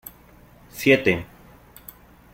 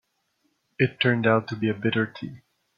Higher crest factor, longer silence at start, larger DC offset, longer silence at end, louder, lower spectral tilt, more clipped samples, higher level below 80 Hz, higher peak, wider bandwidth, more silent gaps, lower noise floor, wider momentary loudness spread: about the same, 24 dB vs 20 dB; about the same, 0.75 s vs 0.8 s; neither; first, 1.1 s vs 0.4 s; first, -20 LUFS vs -24 LUFS; second, -5 dB/octave vs -8 dB/octave; neither; first, -54 dBFS vs -66 dBFS; first, -2 dBFS vs -6 dBFS; first, 16.5 kHz vs 6.8 kHz; neither; second, -51 dBFS vs -72 dBFS; first, 26 LU vs 12 LU